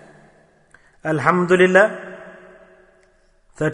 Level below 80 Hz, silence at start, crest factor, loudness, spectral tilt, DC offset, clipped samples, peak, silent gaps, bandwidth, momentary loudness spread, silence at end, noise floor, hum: -58 dBFS; 1.05 s; 20 dB; -17 LUFS; -6.5 dB/octave; under 0.1%; under 0.1%; 0 dBFS; none; 10.5 kHz; 22 LU; 0 s; -57 dBFS; none